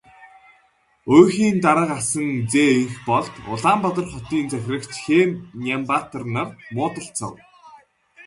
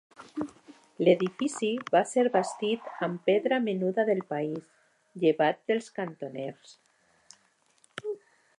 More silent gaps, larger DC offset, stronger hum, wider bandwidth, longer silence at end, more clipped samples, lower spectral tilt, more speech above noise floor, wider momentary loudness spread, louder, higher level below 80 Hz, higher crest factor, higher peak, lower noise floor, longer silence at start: neither; neither; neither; about the same, 11.5 kHz vs 11.5 kHz; second, 0.05 s vs 0.4 s; neither; about the same, -5 dB/octave vs -5.5 dB/octave; about the same, 40 dB vs 40 dB; about the same, 13 LU vs 15 LU; first, -20 LUFS vs -28 LUFS; first, -54 dBFS vs -80 dBFS; about the same, 20 dB vs 22 dB; first, 0 dBFS vs -8 dBFS; second, -60 dBFS vs -68 dBFS; about the same, 0.2 s vs 0.2 s